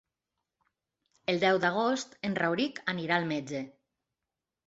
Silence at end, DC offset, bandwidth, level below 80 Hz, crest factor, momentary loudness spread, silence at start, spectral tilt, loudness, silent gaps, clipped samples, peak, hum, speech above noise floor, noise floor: 0.95 s; under 0.1%; 8 kHz; -74 dBFS; 22 dB; 12 LU; 1.3 s; -5 dB/octave; -30 LUFS; none; under 0.1%; -12 dBFS; none; 59 dB; -89 dBFS